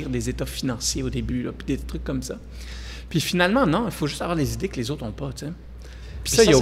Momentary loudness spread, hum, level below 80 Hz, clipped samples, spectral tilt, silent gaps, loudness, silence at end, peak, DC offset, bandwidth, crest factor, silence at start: 17 LU; none; -36 dBFS; under 0.1%; -4.5 dB/octave; none; -25 LUFS; 0 s; -4 dBFS; under 0.1%; 16 kHz; 20 dB; 0 s